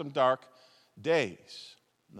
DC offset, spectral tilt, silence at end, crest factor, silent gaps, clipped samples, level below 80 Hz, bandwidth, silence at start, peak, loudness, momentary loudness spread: under 0.1%; -5 dB/octave; 0 s; 18 dB; none; under 0.1%; -86 dBFS; 11.5 kHz; 0 s; -14 dBFS; -30 LUFS; 19 LU